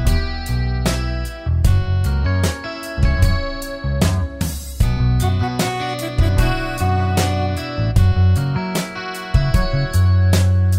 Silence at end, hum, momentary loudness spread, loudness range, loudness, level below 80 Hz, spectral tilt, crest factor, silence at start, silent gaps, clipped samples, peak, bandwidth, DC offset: 0 s; none; 9 LU; 2 LU; -19 LUFS; -22 dBFS; -6 dB/octave; 14 dB; 0 s; none; under 0.1%; -2 dBFS; 16 kHz; under 0.1%